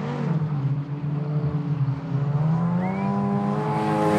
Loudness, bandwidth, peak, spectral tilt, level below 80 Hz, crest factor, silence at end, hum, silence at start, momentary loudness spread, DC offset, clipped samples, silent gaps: -25 LUFS; 9.6 kHz; -10 dBFS; -9 dB/octave; -56 dBFS; 14 dB; 0 s; none; 0 s; 4 LU; under 0.1%; under 0.1%; none